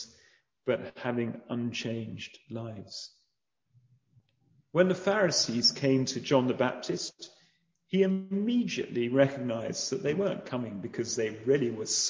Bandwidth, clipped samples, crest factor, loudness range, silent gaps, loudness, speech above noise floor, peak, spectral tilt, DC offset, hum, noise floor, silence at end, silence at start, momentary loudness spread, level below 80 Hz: 8 kHz; under 0.1%; 22 dB; 10 LU; none; -30 LUFS; 51 dB; -8 dBFS; -4 dB/octave; under 0.1%; none; -81 dBFS; 0 s; 0 s; 15 LU; -70 dBFS